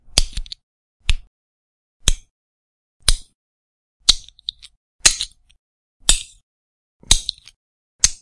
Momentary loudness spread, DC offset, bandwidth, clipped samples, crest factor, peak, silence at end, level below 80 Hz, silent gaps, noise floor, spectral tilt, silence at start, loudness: 16 LU; under 0.1%; 12 kHz; under 0.1%; 22 dB; 0 dBFS; 0.05 s; -28 dBFS; 0.63-1.00 s, 1.27-2.00 s, 2.31-3.00 s, 3.35-4.00 s, 4.77-4.99 s, 5.59-6.00 s, 6.43-7.00 s, 7.56-7.99 s; -35 dBFS; 0 dB/octave; 0.15 s; -19 LUFS